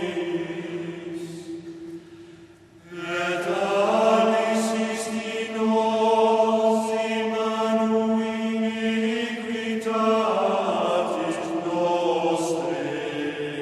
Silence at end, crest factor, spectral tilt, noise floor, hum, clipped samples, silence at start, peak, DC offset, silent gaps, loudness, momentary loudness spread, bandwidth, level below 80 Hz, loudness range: 0 s; 16 dB; -5 dB/octave; -49 dBFS; none; under 0.1%; 0 s; -8 dBFS; under 0.1%; none; -24 LUFS; 14 LU; 13 kHz; -68 dBFS; 5 LU